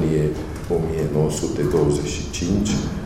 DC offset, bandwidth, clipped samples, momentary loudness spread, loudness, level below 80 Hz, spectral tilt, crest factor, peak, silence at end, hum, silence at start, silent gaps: under 0.1%; 15 kHz; under 0.1%; 6 LU; -22 LUFS; -34 dBFS; -6 dB/octave; 14 dB; -6 dBFS; 0 s; none; 0 s; none